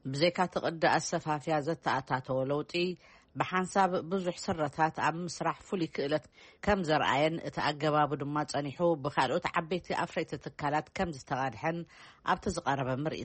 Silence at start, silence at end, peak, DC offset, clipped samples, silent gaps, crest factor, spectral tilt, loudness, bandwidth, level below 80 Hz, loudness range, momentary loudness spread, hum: 0.05 s; 0 s; -14 dBFS; under 0.1%; under 0.1%; none; 18 dB; -5 dB/octave; -32 LUFS; 8.4 kHz; -58 dBFS; 3 LU; 7 LU; none